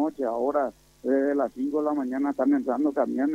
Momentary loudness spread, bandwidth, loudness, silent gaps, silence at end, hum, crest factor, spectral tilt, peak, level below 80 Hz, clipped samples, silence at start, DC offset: 4 LU; 8.8 kHz; -26 LUFS; none; 0 s; none; 14 dB; -7.5 dB/octave; -10 dBFS; -64 dBFS; under 0.1%; 0 s; under 0.1%